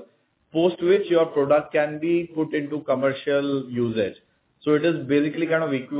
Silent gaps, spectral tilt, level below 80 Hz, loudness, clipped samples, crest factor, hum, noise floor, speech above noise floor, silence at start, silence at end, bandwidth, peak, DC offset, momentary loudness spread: none; -10.5 dB/octave; -64 dBFS; -23 LUFS; under 0.1%; 14 dB; none; -60 dBFS; 38 dB; 0 s; 0 s; 4 kHz; -8 dBFS; under 0.1%; 6 LU